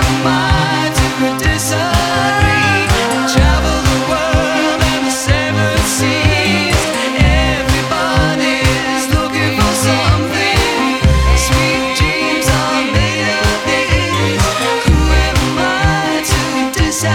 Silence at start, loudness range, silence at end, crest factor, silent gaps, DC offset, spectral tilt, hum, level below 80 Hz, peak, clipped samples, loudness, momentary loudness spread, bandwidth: 0 s; 1 LU; 0 s; 12 dB; none; under 0.1%; -4 dB/octave; none; -20 dBFS; 0 dBFS; under 0.1%; -13 LUFS; 3 LU; 17.5 kHz